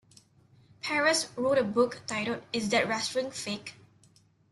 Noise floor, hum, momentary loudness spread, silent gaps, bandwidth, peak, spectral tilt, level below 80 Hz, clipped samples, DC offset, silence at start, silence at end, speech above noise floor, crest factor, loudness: -63 dBFS; none; 11 LU; none; 12.5 kHz; -12 dBFS; -3 dB/octave; -70 dBFS; under 0.1%; under 0.1%; 0.85 s; 0.8 s; 34 dB; 18 dB; -29 LUFS